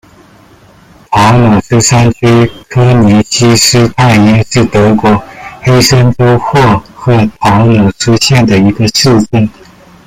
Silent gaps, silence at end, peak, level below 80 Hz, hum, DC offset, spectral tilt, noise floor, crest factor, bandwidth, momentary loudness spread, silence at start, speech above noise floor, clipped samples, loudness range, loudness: none; 0.55 s; 0 dBFS; -32 dBFS; none; under 0.1%; -5 dB/octave; -39 dBFS; 8 dB; 16 kHz; 6 LU; 1.1 s; 33 dB; under 0.1%; 2 LU; -7 LUFS